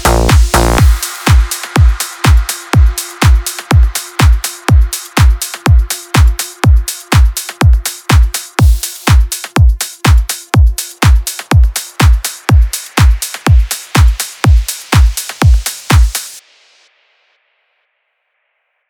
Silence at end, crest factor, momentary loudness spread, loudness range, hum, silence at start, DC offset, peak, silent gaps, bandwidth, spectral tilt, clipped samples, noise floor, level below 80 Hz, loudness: 2.5 s; 10 dB; 4 LU; 2 LU; none; 0 s; under 0.1%; 0 dBFS; none; 19 kHz; -4.5 dB/octave; under 0.1%; -65 dBFS; -12 dBFS; -11 LUFS